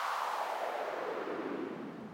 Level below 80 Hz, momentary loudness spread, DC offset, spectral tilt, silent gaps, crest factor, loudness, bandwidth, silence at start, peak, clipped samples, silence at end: -84 dBFS; 6 LU; under 0.1%; -4 dB/octave; none; 14 dB; -38 LUFS; 19.5 kHz; 0 s; -24 dBFS; under 0.1%; 0 s